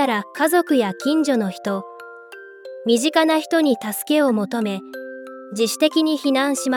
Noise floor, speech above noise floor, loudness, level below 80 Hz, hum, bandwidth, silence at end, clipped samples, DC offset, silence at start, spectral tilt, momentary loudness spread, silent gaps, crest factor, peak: -40 dBFS; 21 dB; -20 LUFS; -76 dBFS; none; 18 kHz; 0 s; under 0.1%; under 0.1%; 0 s; -4 dB/octave; 19 LU; none; 16 dB; -4 dBFS